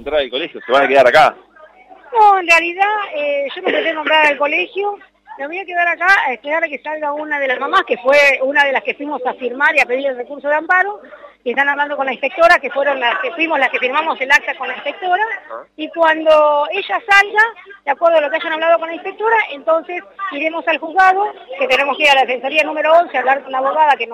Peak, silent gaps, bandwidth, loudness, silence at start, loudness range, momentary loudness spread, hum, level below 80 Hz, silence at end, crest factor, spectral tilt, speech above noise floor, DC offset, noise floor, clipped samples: -2 dBFS; none; 15 kHz; -14 LUFS; 0 s; 3 LU; 11 LU; none; -56 dBFS; 0 s; 14 dB; -2.5 dB/octave; 28 dB; under 0.1%; -43 dBFS; under 0.1%